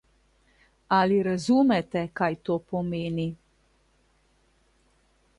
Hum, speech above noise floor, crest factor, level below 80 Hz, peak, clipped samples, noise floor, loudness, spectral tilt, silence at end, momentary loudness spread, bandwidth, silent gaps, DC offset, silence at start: none; 41 dB; 18 dB; -60 dBFS; -10 dBFS; under 0.1%; -66 dBFS; -26 LUFS; -6.5 dB/octave; 2.05 s; 10 LU; 11 kHz; none; under 0.1%; 0.9 s